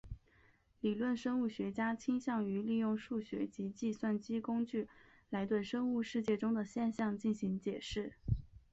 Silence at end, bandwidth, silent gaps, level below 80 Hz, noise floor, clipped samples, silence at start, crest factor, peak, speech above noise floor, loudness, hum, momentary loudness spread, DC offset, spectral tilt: 0.15 s; 8 kHz; none; -58 dBFS; -69 dBFS; under 0.1%; 0.05 s; 16 dB; -22 dBFS; 32 dB; -38 LUFS; none; 6 LU; under 0.1%; -7 dB/octave